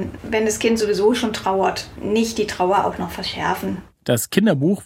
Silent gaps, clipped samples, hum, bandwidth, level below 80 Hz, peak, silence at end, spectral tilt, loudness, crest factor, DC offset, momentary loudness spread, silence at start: none; under 0.1%; none; 16.5 kHz; -48 dBFS; -2 dBFS; 0 s; -4.5 dB/octave; -20 LUFS; 18 dB; under 0.1%; 8 LU; 0 s